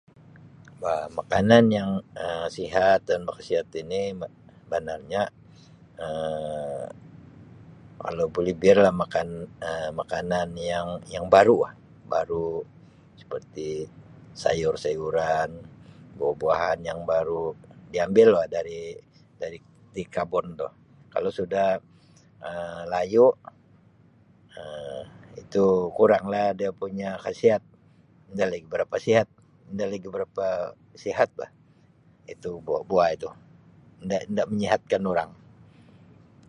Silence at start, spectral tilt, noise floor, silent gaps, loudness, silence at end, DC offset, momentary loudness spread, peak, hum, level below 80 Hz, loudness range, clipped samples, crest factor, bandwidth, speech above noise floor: 0.45 s; -6 dB/octave; -58 dBFS; none; -25 LUFS; 1.15 s; under 0.1%; 19 LU; -2 dBFS; none; -56 dBFS; 7 LU; under 0.1%; 24 dB; 10.5 kHz; 33 dB